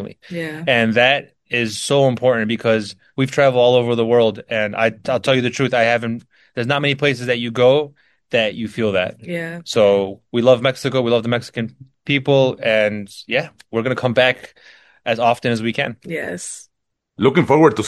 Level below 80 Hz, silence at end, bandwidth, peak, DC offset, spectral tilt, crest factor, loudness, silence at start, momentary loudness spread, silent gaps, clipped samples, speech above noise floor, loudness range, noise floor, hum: -58 dBFS; 0 s; 12.5 kHz; 0 dBFS; under 0.1%; -5 dB/octave; 18 dB; -18 LUFS; 0 s; 13 LU; none; under 0.1%; 54 dB; 3 LU; -72 dBFS; none